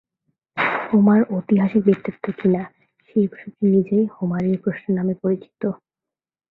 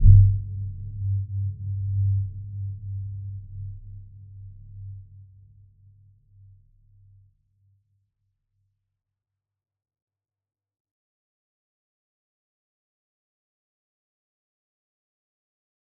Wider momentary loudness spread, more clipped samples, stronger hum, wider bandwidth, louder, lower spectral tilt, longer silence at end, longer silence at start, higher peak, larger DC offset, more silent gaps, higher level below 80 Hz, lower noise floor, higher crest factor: second, 11 LU vs 21 LU; neither; neither; first, 4.2 kHz vs 0.5 kHz; first, -20 LUFS vs -26 LUFS; second, -10.5 dB/octave vs -17.5 dB/octave; second, 0.75 s vs 10.75 s; first, 0.55 s vs 0 s; about the same, -4 dBFS vs -2 dBFS; neither; neither; second, -62 dBFS vs -34 dBFS; about the same, -88 dBFS vs -87 dBFS; second, 18 dB vs 26 dB